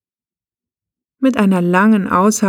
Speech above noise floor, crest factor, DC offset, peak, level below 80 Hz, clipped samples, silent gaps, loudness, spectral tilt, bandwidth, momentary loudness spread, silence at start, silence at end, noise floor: over 77 dB; 14 dB; under 0.1%; -2 dBFS; -56 dBFS; under 0.1%; none; -14 LUFS; -6 dB/octave; 16.5 kHz; 5 LU; 1.2 s; 0 s; under -90 dBFS